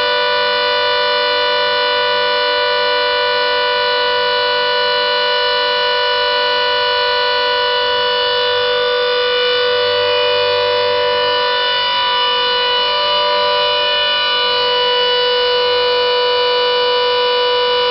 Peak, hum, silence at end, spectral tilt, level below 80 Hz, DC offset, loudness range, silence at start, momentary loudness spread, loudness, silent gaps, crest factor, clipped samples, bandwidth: -6 dBFS; none; 0 s; -3.5 dB/octave; -52 dBFS; under 0.1%; 1 LU; 0 s; 1 LU; -13 LUFS; none; 8 dB; under 0.1%; 6 kHz